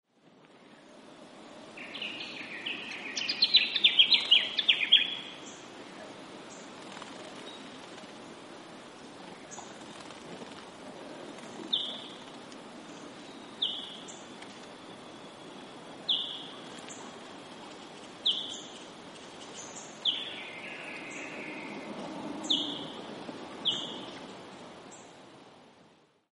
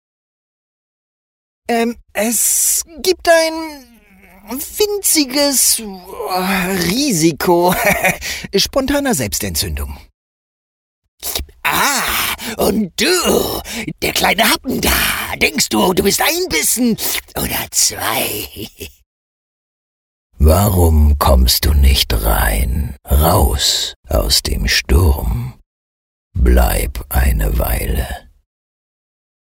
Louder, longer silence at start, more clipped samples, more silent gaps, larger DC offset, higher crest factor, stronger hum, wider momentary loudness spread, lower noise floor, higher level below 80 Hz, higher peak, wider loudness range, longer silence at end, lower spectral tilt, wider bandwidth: second, -28 LUFS vs -15 LUFS; second, 0.25 s vs 1.7 s; neither; second, none vs 10.14-11.02 s, 11.08-11.18 s, 19.06-20.30 s, 23.96-24.03 s, 25.66-26.31 s; neither; first, 26 dB vs 16 dB; neither; first, 24 LU vs 11 LU; first, -62 dBFS vs -45 dBFS; second, -78 dBFS vs -22 dBFS; second, -8 dBFS vs 0 dBFS; first, 21 LU vs 5 LU; second, 0.4 s vs 1.3 s; second, -1.5 dB/octave vs -3.5 dB/octave; second, 11.5 kHz vs over 20 kHz